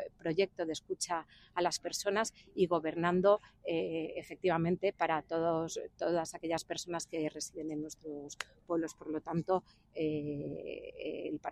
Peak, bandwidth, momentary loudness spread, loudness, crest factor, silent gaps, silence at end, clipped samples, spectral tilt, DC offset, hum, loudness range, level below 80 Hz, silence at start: -14 dBFS; 15 kHz; 10 LU; -36 LUFS; 22 dB; none; 0 s; under 0.1%; -4.5 dB/octave; under 0.1%; none; 6 LU; -68 dBFS; 0 s